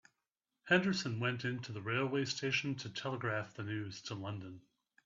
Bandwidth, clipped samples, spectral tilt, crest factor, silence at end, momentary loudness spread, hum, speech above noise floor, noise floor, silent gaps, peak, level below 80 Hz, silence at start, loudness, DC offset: 7.8 kHz; under 0.1%; -4 dB/octave; 22 dB; 0.45 s; 12 LU; none; 52 dB; -89 dBFS; none; -16 dBFS; -76 dBFS; 0.65 s; -37 LUFS; under 0.1%